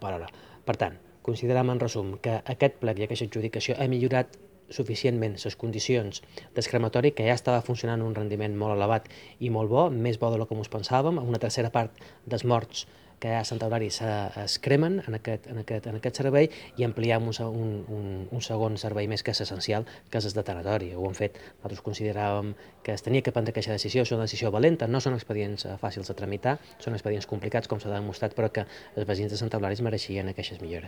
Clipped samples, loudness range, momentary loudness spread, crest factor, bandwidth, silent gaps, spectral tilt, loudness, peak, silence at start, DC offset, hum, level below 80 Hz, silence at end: under 0.1%; 4 LU; 11 LU; 22 dB; 19 kHz; none; -6 dB/octave; -29 LUFS; -6 dBFS; 0 s; under 0.1%; none; -60 dBFS; 0 s